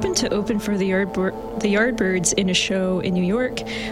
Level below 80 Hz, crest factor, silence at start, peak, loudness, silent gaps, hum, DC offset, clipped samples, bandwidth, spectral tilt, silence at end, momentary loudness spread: -44 dBFS; 18 dB; 0 s; -4 dBFS; -21 LUFS; none; none; under 0.1%; under 0.1%; 15.5 kHz; -4 dB/octave; 0 s; 6 LU